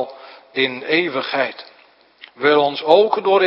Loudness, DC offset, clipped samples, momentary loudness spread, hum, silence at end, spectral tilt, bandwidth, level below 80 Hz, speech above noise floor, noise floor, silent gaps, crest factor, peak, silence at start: -17 LUFS; under 0.1%; under 0.1%; 12 LU; none; 0 s; -6.5 dB/octave; 5.8 kHz; -72 dBFS; 35 dB; -52 dBFS; none; 18 dB; 0 dBFS; 0 s